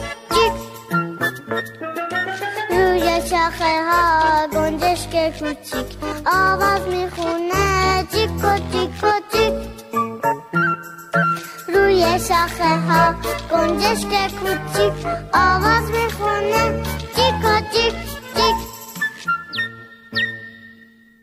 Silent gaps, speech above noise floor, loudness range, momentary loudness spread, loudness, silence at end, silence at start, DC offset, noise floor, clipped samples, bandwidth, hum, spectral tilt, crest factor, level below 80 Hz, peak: none; 30 dB; 3 LU; 10 LU; -19 LUFS; 0.4 s; 0 s; under 0.1%; -48 dBFS; under 0.1%; 16 kHz; none; -4.5 dB/octave; 16 dB; -38 dBFS; -2 dBFS